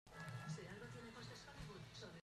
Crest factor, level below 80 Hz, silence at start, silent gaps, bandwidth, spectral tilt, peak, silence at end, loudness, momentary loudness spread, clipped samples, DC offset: 16 dB; -70 dBFS; 0.05 s; none; 13.5 kHz; -5 dB/octave; -38 dBFS; 0 s; -54 LUFS; 5 LU; under 0.1%; under 0.1%